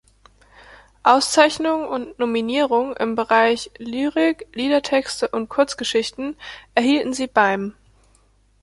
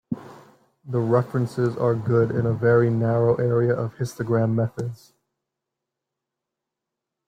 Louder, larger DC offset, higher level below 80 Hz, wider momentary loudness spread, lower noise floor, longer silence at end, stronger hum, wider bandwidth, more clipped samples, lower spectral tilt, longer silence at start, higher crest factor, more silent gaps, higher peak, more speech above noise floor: about the same, -20 LUFS vs -22 LUFS; neither; about the same, -56 dBFS vs -60 dBFS; about the same, 10 LU vs 10 LU; second, -58 dBFS vs -85 dBFS; second, 0.9 s vs 2.3 s; neither; first, 11.5 kHz vs 9.8 kHz; neither; second, -3 dB/octave vs -9 dB/octave; first, 0.7 s vs 0.1 s; about the same, 20 dB vs 18 dB; neither; first, -2 dBFS vs -6 dBFS; second, 38 dB vs 63 dB